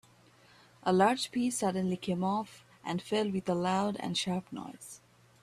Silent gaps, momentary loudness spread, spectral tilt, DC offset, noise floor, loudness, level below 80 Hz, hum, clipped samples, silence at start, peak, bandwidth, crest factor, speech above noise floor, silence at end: none; 18 LU; -5 dB/octave; under 0.1%; -61 dBFS; -32 LUFS; -70 dBFS; none; under 0.1%; 0.85 s; -14 dBFS; 14 kHz; 18 dB; 30 dB; 0.45 s